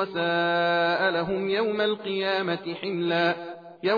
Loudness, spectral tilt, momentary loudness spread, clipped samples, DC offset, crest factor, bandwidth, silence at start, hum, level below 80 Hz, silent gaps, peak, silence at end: -25 LUFS; -7 dB/octave; 8 LU; under 0.1%; under 0.1%; 14 dB; 5 kHz; 0 s; none; -64 dBFS; none; -12 dBFS; 0 s